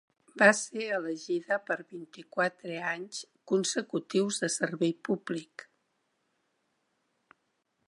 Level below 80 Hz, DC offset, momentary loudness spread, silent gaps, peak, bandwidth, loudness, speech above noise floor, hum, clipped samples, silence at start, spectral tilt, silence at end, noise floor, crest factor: -86 dBFS; under 0.1%; 17 LU; none; -6 dBFS; 11.5 kHz; -30 LUFS; 47 dB; none; under 0.1%; 0.35 s; -3.5 dB/octave; 2.45 s; -78 dBFS; 26 dB